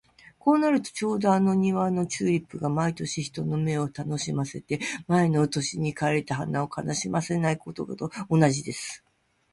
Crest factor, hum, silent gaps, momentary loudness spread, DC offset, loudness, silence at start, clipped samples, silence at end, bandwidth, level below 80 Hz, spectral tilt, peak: 18 dB; none; none; 9 LU; under 0.1%; -26 LUFS; 0.45 s; under 0.1%; 0.55 s; 11.5 kHz; -60 dBFS; -5.5 dB/octave; -8 dBFS